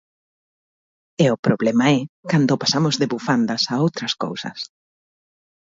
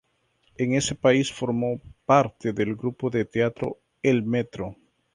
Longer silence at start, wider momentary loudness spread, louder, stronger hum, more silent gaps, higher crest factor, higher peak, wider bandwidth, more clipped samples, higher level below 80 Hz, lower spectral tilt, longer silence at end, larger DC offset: first, 1.2 s vs 0.6 s; about the same, 12 LU vs 12 LU; first, -20 LUFS vs -25 LUFS; neither; first, 1.39-1.43 s, 2.09-2.23 s vs none; about the same, 18 dB vs 20 dB; about the same, -4 dBFS vs -6 dBFS; second, 7.8 kHz vs 11.5 kHz; neither; second, -64 dBFS vs -56 dBFS; about the same, -5 dB/octave vs -5.5 dB/octave; first, 1.1 s vs 0.4 s; neither